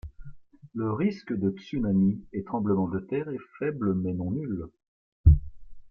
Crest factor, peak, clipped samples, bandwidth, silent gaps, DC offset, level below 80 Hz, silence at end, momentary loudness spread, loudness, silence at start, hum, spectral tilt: 22 dB; -6 dBFS; under 0.1%; 5.6 kHz; 4.88-5.24 s; under 0.1%; -34 dBFS; 0 s; 12 LU; -28 LUFS; 0.05 s; none; -10.5 dB/octave